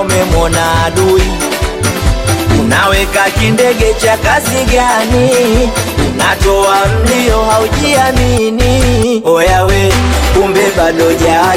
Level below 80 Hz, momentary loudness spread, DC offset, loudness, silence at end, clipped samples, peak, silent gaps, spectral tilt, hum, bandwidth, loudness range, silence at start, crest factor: -18 dBFS; 4 LU; under 0.1%; -10 LUFS; 0 s; under 0.1%; 0 dBFS; none; -4.5 dB/octave; none; 17 kHz; 1 LU; 0 s; 10 dB